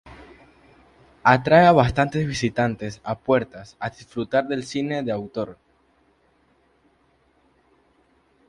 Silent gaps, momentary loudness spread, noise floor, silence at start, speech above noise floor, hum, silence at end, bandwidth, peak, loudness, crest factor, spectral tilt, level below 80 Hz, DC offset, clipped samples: none; 18 LU; -62 dBFS; 0.05 s; 41 dB; none; 2.95 s; 11 kHz; 0 dBFS; -21 LUFS; 22 dB; -6.5 dB/octave; -50 dBFS; under 0.1%; under 0.1%